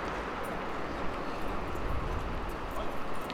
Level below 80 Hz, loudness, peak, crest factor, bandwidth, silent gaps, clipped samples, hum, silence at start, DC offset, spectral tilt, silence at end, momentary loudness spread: -42 dBFS; -37 LUFS; -20 dBFS; 14 dB; 17 kHz; none; under 0.1%; none; 0 s; under 0.1%; -6 dB/octave; 0 s; 2 LU